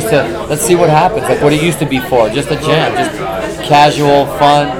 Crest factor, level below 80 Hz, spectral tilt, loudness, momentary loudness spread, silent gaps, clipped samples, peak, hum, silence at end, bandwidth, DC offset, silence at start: 10 dB; -36 dBFS; -5 dB/octave; -11 LUFS; 8 LU; none; 0.5%; 0 dBFS; none; 0 s; 19 kHz; under 0.1%; 0 s